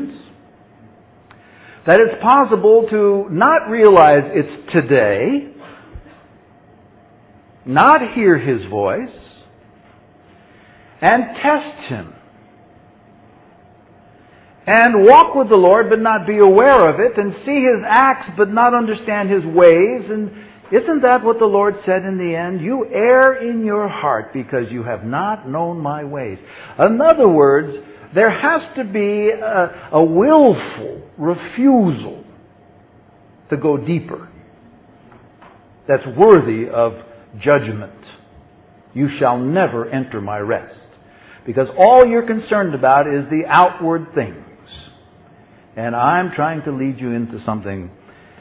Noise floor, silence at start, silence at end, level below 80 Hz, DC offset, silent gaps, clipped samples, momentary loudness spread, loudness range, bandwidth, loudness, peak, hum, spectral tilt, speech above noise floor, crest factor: -47 dBFS; 0 s; 0.5 s; -52 dBFS; under 0.1%; none; under 0.1%; 15 LU; 9 LU; 4 kHz; -14 LUFS; 0 dBFS; none; -10.5 dB/octave; 34 dB; 16 dB